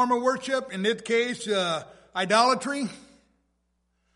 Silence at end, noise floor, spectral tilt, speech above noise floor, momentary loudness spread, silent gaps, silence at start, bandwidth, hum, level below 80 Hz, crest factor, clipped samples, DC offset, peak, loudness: 1.15 s; -73 dBFS; -3.5 dB/octave; 48 dB; 11 LU; none; 0 s; 11.5 kHz; none; -70 dBFS; 22 dB; under 0.1%; under 0.1%; -6 dBFS; -26 LUFS